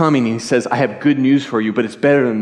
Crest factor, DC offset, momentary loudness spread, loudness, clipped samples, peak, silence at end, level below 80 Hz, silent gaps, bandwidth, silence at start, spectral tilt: 12 dB; under 0.1%; 5 LU; -16 LUFS; under 0.1%; -2 dBFS; 0 s; -66 dBFS; none; 10.5 kHz; 0 s; -6.5 dB/octave